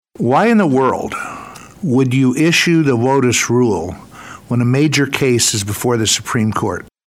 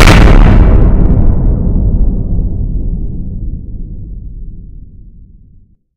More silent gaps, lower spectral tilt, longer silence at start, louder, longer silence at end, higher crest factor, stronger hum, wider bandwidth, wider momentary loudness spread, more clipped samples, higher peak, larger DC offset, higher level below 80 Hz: neither; second, -4.5 dB/octave vs -6.5 dB/octave; first, 0.2 s vs 0 s; second, -14 LUFS vs -11 LUFS; second, 0.2 s vs 1.1 s; first, 14 dB vs 8 dB; neither; first, 16.5 kHz vs 10.5 kHz; second, 14 LU vs 22 LU; second, under 0.1% vs 4%; about the same, 0 dBFS vs 0 dBFS; neither; second, -52 dBFS vs -10 dBFS